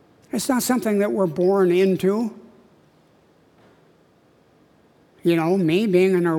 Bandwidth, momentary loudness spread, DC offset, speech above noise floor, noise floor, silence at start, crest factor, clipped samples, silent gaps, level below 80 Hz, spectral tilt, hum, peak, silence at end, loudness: 18 kHz; 8 LU; under 0.1%; 38 dB; -57 dBFS; 0.35 s; 16 dB; under 0.1%; none; -66 dBFS; -6 dB/octave; none; -6 dBFS; 0 s; -20 LUFS